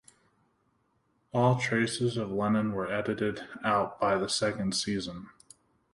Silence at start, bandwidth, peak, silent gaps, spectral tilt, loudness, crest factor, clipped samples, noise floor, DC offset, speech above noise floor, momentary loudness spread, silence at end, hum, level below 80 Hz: 1.35 s; 11.5 kHz; -12 dBFS; none; -5 dB/octave; -29 LUFS; 20 dB; under 0.1%; -72 dBFS; under 0.1%; 43 dB; 7 LU; 0.65 s; none; -62 dBFS